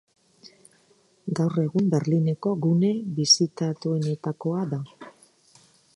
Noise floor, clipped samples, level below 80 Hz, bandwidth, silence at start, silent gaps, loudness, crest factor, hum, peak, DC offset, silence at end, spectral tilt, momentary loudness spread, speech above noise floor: -62 dBFS; under 0.1%; -70 dBFS; 11 kHz; 0.45 s; none; -24 LUFS; 20 dB; none; -6 dBFS; under 0.1%; 0.85 s; -5.5 dB/octave; 12 LU; 38 dB